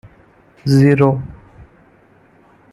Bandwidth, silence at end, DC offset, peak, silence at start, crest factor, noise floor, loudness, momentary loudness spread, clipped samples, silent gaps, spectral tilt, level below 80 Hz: 12 kHz; 1.4 s; under 0.1%; -2 dBFS; 0.65 s; 16 dB; -50 dBFS; -14 LUFS; 16 LU; under 0.1%; none; -8 dB/octave; -48 dBFS